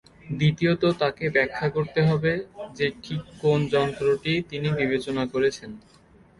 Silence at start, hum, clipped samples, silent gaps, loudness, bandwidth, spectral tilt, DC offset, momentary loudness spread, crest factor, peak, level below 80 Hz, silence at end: 0.25 s; none; under 0.1%; none; -24 LUFS; 11.5 kHz; -6.5 dB/octave; under 0.1%; 10 LU; 18 dB; -8 dBFS; -54 dBFS; 0.6 s